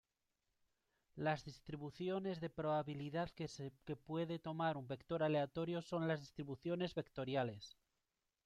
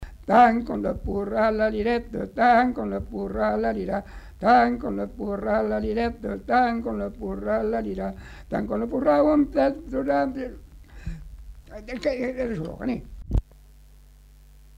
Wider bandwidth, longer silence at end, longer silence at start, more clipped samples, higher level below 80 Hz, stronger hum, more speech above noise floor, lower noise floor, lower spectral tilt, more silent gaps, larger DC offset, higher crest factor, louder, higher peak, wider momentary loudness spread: second, 10 kHz vs 11.5 kHz; second, 0.75 s vs 1.35 s; first, 1.15 s vs 0 s; neither; second, -74 dBFS vs -40 dBFS; neither; first, 47 dB vs 26 dB; first, -90 dBFS vs -50 dBFS; about the same, -7 dB/octave vs -7.5 dB/octave; neither; neither; about the same, 18 dB vs 18 dB; second, -43 LUFS vs -24 LUFS; second, -26 dBFS vs -6 dBFS; second, 10 LU vs 15 LU